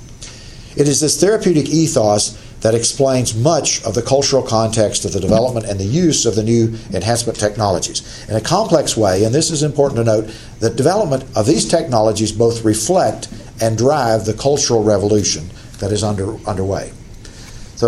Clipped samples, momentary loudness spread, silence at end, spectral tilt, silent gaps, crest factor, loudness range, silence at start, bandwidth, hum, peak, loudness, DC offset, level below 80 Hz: under 0.1%; 9 LU; 0 s; -4.5 dB/octave; none; 16 dB; 2 LU; 0 s; 14 kHz; none; 0 dBFS; -15 LUFS; under 0.1%; -38 dBFS